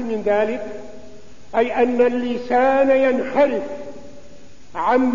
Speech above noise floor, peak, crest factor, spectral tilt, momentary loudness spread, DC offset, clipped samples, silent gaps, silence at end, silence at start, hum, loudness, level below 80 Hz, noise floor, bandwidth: 27 dB; -4 dBFS; 14 dB; -6 dB/octave; 18 LU; 2%; under 0.1%; none; 0 s; 0 s; none; -19 LUFS; -52 dBFS; -45 dBFS; 7.4 kHz